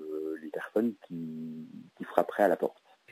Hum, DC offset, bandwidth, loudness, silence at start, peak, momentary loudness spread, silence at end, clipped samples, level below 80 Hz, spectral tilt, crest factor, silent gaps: none; under 0.1%; 16 kHz; -32 LUFS; 0 s; -8 dBFS; 16 LU; 0 s; under 0.1%; -82 dBFS; -7 dB/octave; 24 dB; none